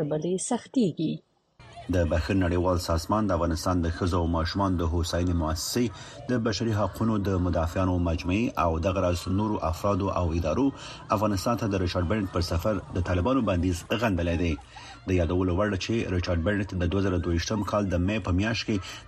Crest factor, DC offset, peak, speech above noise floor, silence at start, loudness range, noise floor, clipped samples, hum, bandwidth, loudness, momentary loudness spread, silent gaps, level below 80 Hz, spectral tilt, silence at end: 16 dB; under 0.1%; -10 dBFS; 25 dB; 0 s; 1 LU; -51 dBFS; under 0.1%; none; 13.5 kHz; -27 LUFS; 3 LU; none; -40 dBFS; -6 dB/octave; 0 s